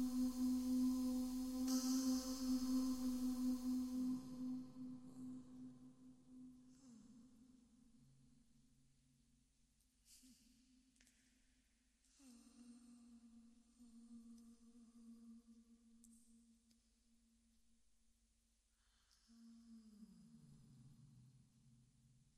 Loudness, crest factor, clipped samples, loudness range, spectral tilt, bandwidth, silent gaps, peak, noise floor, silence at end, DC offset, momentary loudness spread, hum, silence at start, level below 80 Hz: -43 LUFS; 18 dB; under 0.1%; 26 LU; -4 dB/octave; 16 kHz; none; -30 dBFS; -81 dBFS; 1.1 s; under 0.1%; 26 LU; none; 0 s; -72 dBFS